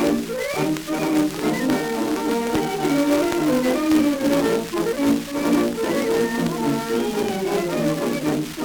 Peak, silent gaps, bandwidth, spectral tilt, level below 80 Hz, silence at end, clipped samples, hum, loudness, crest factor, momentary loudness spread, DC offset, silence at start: -4 dBFS; none; over 20 kHz; -5 dB/octave; -48 dBFS; 0 s; under 0.1%; none; -21 LUFS; 16 dB; 4 LU; under 0.1%; 0 s